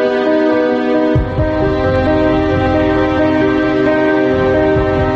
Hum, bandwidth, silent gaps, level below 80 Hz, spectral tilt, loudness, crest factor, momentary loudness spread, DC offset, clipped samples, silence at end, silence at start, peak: none; 7 kHz; none; -28 dBFS; -8 dB/octave; -13 LUFS; 10 dB; 2 LU; under 0.1%; under 0.1%; 0 s; 0 s; -4 dBFS